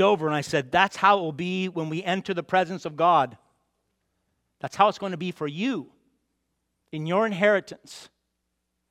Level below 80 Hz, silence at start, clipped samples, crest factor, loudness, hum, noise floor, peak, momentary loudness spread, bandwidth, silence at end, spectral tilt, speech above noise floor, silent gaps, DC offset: -68 dBFS; 0 s; under 0.1%; 22 dB; -24 LUFS; none; -78 dBFS; -4 dBFS; 16 LU; 14 kHz; 0.85 s; -5.5 dB/octave; 54 dB; none; under 0.1%